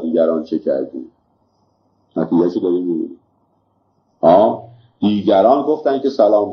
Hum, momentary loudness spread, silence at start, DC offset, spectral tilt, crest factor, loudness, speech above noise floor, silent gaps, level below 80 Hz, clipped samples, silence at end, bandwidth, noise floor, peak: none; 14 LU; 0 s; under 0.1%; -8.5 dB/octave; 16 dB; -16 LUFS; 47 dB; none; -62 dBFS; under 0.1%; 0 s; 6.2 kHz; -62 dBFS; 0 dBFS